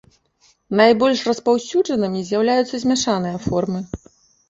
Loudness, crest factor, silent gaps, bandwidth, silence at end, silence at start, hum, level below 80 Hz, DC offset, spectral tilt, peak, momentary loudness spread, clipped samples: -19 LUFS; 18 dB; none; 8 kHz; 0.55 s; 0.7 s; none; -50 dBFS; under 0.1%; -5 dB/octave; -2 dBFS; 10 LU; under 0.1%